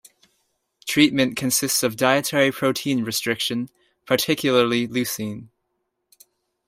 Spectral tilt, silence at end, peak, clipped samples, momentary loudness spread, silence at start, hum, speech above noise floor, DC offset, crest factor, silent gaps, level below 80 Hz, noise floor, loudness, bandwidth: -3.5 dB/octave; 1.2 s; -4 dBFS; under 0.1%; 11 LU; 0.85 s; none; 55 dB; under 0.1%; 20 dB; none; -62 dBFS; -76 dBFS; -21 LUFS; 16 kHz